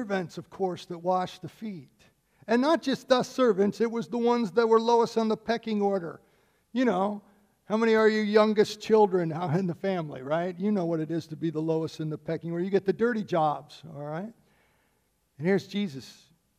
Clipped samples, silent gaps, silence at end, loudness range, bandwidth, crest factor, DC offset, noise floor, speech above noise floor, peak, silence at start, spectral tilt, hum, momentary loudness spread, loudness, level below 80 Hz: under 0.1%; none; 0.45 s; 6 LU; 13.5 kHz; 20 dB; under 0.1%; -71 dBFS; 45 dB; -8 dBFS; 0 s; -6.5 dB/octave; none; 15 LU; -27 LUFS; -72 dBFS